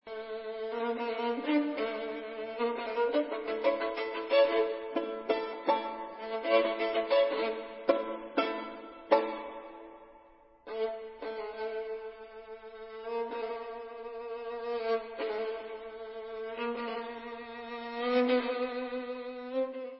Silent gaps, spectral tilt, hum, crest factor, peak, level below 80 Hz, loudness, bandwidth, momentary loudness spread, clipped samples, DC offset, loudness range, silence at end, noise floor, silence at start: none; -1 dB/octave; none; 22 dB; -10 dBFS; -72 dBFS; -33 LUFS; 5.6 kHz; 15 LU; under 0.1%; under 0.1%; 9 LU; 0 s; -59 dBFS; 0.05 s